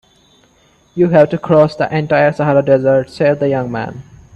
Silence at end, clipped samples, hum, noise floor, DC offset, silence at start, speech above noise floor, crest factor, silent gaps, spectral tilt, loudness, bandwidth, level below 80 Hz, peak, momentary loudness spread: 0.35 s; under 0.1%; none; -52 dBFS; under 0.1%; 0.95 s; 39 dB; 14 dB; none; -8.5 dB/octave; -13 LUFS; 8.6 kHz; -50 dBFS; 0 dBFS; 10 LU